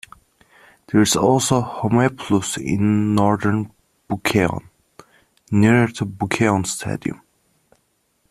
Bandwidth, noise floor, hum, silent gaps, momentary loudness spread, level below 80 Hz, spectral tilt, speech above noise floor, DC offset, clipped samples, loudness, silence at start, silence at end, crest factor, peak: 14 kHz; -66 dBFS; none; none; 11 LU; -50 dBFS; -5 dB/octave; 48 dB; under 0.1%; under 0.1%; -19 LUFS; 0.95 s; 1.15 s; 20 dB; 0 dBFS